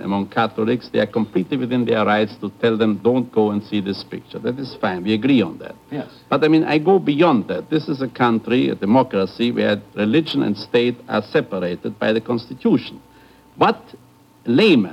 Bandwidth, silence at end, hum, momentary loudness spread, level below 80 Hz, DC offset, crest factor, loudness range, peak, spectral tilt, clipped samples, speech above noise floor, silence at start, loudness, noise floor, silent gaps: 12 kHz; 0 s; none; 10 LU; -60 dBFS; under 0.1%; 18 dB; 4 LU; -2 dBFS; -7.5 dB/octave; under 0.1%; 30 dB; 0 s; -19 LUFS; -48 dBFS; none